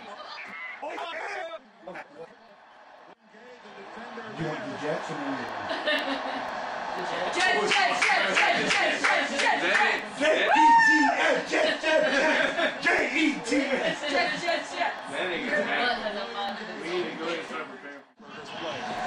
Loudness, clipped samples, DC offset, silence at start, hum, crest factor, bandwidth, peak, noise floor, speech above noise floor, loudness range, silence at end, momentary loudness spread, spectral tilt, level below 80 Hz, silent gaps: -25 LUFS; under 0.1%; under 0.1%; 0 s; none; 18 dB; 11 kHz; -10 dBFS; -52 dBFS; 26 dB; 17 LU; 0 s; 18 LU; -2.5 dB/octave; -66 dBFS; none